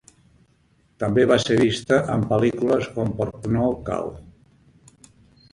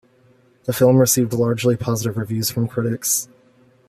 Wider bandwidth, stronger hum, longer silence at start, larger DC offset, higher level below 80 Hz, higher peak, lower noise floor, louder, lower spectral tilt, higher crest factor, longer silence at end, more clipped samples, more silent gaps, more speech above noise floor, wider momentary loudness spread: second, 11.5 kHz vs 15 kHz; neither; first, 1 s vs 0.65 s; neither; first, -48 dBFS vs -56 dBFS; about the same, -2 dBFS vs -2 dBFS; first, -61 dBFS vs -55 dBFS; about the same, -21 LUFS vs -19 LUFS; about the same, -6 dB/octave vs -5 dB/octave; about the same, 20 dB vs 18 dB; first, 1.25 s vs 0.65 s; neither; neither; about the same, 40 dB vs 37 dB; about the same, 10 LU vs 9 LU